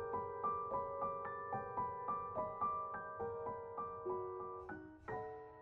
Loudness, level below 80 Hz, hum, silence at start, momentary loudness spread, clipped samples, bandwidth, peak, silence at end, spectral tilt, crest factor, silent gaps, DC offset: -44 LUFS; -70 dBFS; none; 0 s; 8 LU; under 0.1%; 4.2 kHz; -30 dBFS; 0 s; -9.5 dB/octave; 14 dB; none; under 0.1%